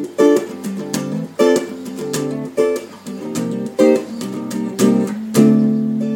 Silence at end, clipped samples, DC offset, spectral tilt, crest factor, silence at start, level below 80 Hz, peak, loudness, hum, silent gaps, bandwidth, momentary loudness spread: 0 s; under 0.1%; under 0.1%; -6 dB/octave; 16 dB; 0 s; -68 dBFS; 0 dBFS; -18 LUFS; none; none; 17 kHz; 12 LU